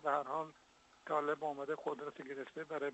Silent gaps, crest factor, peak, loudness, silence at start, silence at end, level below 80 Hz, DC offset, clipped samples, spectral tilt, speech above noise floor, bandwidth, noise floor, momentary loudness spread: none; 20 dB; -22 dBFS; -41 LUFS; 0 s; 0 s; -84 dBFS; under 0.1%; under 0.1%; -5.5 dB/octave; 27 dB; 8.2 kHz; -67 dBFS; 10 LU